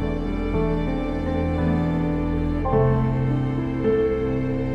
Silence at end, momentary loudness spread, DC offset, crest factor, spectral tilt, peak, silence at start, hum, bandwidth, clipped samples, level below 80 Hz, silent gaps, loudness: 0 s; 5 LU; under 0.1%; 14 dB; -9.5 dB/octave; -8 dBFS; 0 s; none; 6.2 kHz; under 0.1%; -30 dBFS; none; -23 LUFS